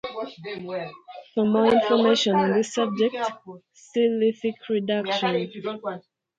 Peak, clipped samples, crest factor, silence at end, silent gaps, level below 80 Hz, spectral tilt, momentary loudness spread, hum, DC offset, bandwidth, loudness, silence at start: -6 dBFS; under 0.1%; 18 dB; 0.4 s; none; -68 dBFS; -5 dB/octave; 15 LU; none; under 0.1%; 9 kHz; -24 LUFS; 0.05 s